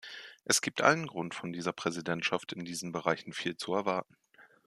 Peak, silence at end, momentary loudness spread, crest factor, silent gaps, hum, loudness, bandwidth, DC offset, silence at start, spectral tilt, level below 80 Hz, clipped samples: -8 dBFS; 0.25 s; 11 LU; 26 dB; none; none; -32 LUFS; 14 kHz; under 0.1%; 0.05 s; -3 dB/octave; -76 dBFS; under 0.1%